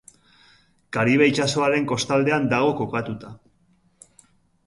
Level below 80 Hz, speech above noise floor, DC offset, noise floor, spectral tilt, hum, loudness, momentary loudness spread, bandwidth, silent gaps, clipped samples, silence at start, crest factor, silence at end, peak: -60 dBFS; 41 dB; under 0.1%; -62 dBFS; -5 dB/octave; none; -21 LUFS; 12 LU; 11.5 kHz; none; under 0.1%; 0.9 s; 20 dB; 1.3 s; -4 dBFS